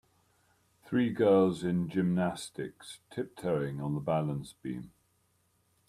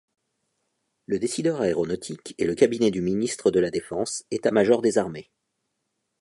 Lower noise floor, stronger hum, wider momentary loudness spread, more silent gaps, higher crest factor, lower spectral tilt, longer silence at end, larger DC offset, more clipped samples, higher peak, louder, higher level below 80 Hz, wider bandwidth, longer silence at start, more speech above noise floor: second, -72 dBFS vs -78 dBFS; neither; first, 16 LU vs 10 LU; neither; about the same, 18 dB vs 20 dB; first, -7 dB/octave vs -5 dB/octave; about the same, 1 s vs 1 s; neither; neither; second, -14 dBFS vs -4 dBFS; second, -31 LUFS vs -24 LUFS; second, -66 dBFS vs -58 dBFS; first, 13.5 kHz vs 11.5 kHz; second, 0.85 s vs 1.1 s; second, 42 dB vs 55 dB